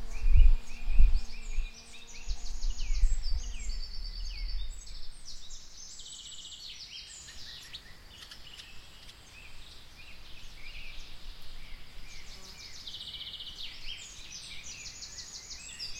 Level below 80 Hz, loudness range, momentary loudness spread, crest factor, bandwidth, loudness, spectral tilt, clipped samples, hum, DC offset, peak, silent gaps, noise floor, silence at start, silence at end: -32 dBFS; 12 LU; 19 LU; 22 dB; 9 kHz; -39 LUFS; -2.5 dB/octave; under 0.1%; none; under 0.1%; -8 dBFS; none; -50 dBFS; 0 s; 0 s